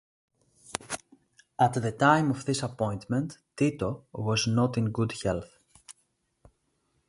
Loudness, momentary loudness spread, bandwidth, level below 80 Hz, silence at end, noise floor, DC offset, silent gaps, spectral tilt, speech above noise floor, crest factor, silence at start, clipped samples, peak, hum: -28 LUFS; 15 LU; 11.5 kHz; -56 dBFS; 1.15 s; -74 dBFS; under 0.1%; none; -5.5 dB/octave; 47 dB; 24 dB; 0.7 s; under 0.1%; -6 dBFS; none